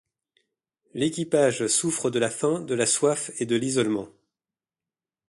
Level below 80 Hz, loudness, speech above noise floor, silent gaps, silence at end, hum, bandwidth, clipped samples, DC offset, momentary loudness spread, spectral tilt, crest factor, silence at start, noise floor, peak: -68 dBFS; -24 LUFS; over 66 dB; none; 1.2 s; none; 11.5 kHz; under 0.1%; under 0.1%; 7 LU; -3.5 dB/octave; 20 dB; 0.95 s; under -90 dBFS; -8 dBFS